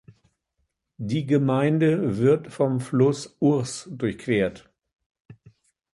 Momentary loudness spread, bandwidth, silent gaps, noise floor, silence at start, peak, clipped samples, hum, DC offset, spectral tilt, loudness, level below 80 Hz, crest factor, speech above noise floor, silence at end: 8 LU; 11.5 kHz; 5.06-5.10 s, 5.20-5.25 s; -76 dBFS; 1 s; -6 dBFS; under 0.1%; none; under 0.1%; -7 dB/octave; -23 LUFS; -58 dBFS; 18 dB; 53 dB; 0.6 s